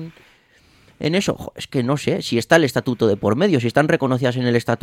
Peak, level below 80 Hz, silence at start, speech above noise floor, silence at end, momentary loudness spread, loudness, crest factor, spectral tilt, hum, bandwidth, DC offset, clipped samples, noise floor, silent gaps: 0 dBFS; -54 dBFS; 0 s; 36 dB; 0.05 s; 9 LU; -19 LUFS; 20 dB; -6 dB/octave; none; 16 kHz; under 0.1%; under 0.1%; -54 dBFS; none